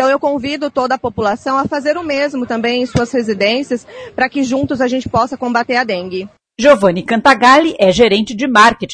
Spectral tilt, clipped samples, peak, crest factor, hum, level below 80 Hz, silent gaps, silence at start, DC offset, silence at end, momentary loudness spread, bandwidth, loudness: -4.5 dB/octave; 0.1%; 0 dBFS; 14 dB; none; -44 dBFS; none; 0 s; under 0.1%; 0 s; 9 LU; 11 kHz; -13 LUFS